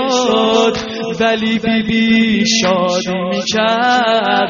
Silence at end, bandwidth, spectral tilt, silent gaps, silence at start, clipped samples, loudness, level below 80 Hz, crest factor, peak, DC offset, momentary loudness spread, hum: 0 s; 7.4 kHz; -2.5 dB/octave; none; 0 s; under 0.1%; -14 LUFS; -46 dBFS; 12 dB; -2 dBFS; under 0.1%; 5 LU; none